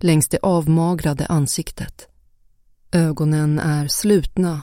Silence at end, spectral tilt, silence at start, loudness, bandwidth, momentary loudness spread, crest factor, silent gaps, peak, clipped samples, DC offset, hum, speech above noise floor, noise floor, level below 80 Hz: 0 s; -5.5 dB/octave; 0 s; -19 LUFS; 16.5 kHz; 7 LU; 16 dB; none; -4 dBFS; under 0.1%; under 0.1%; none; 36 dB; -54 dBFS; -40 dBFS